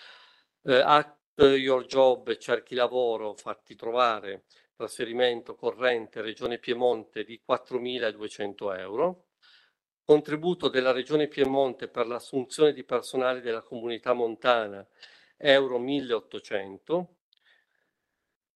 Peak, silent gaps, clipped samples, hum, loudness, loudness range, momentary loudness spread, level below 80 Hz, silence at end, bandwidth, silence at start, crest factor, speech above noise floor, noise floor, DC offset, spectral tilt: -4 dBFS; 1.24-1.37 s; under 0.1%; none; -27 LUFS; 5 LU; 14 LU; -66 dBFS; 1.5 s; 12.5 kHz; 0 s; 24 dB; 57 dB; -84 dBFS; under 0.1%; -4.5 dB/octave